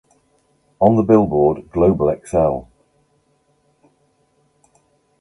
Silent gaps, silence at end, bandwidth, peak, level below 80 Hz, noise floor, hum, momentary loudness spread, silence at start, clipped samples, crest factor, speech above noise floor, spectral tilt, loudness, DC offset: none; 2.6 s; 11.5 kHz; 0 dBFS; -42 dBFS; -62 dBFS; none; 6 LU; 0.8 s; under 0.1%; 18 dB; 47 dB; -10 dB/octave; -16 LUFS; under 0.1%